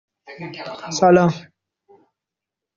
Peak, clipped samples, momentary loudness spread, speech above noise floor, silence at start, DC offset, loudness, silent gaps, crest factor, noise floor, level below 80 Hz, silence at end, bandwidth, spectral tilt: -2 dBFS; under 0.1%; 20 LU; 68 dB; 0.3 s; under 0.1%; -16 LUFS; none; 20 dB; -86 dBFS; -58 dBFS; 1.4 s; 7.6 kHz; -5.5 dB/octave